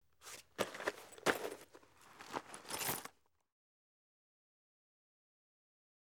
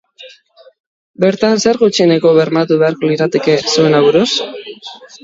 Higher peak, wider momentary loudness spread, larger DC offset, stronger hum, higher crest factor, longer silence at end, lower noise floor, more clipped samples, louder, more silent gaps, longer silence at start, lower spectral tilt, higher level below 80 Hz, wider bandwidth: second, -14 dBFS vs 0 dBFS; first, 19 LU vs 16 LU; neither; neither; first, 32 dB vs 14 dB; first, 3.1 s vs 0.2 s; first, -63 dBFS vs -44 dBFS; neither; second, -42 LUFS vs -12 LUFS; second, none vs 0.80-1.14 s; about the same, 0.2 s vs 0.2 s; second, -2 dB/octave vs -5 dB/octave; second, -78 dBFS vs -56 dBFS; first, over 20 kHz vs 7.8 kHz